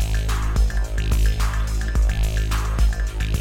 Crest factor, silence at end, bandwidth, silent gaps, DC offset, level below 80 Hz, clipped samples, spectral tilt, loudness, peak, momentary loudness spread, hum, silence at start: 12 dB; 0 s; 15.5 kHz; none; under 0.1%; -20 dBFS; under 0.1%; -5 dB/octave; -23 LUFS; -8 dBFS; 3 LU; none; 0 s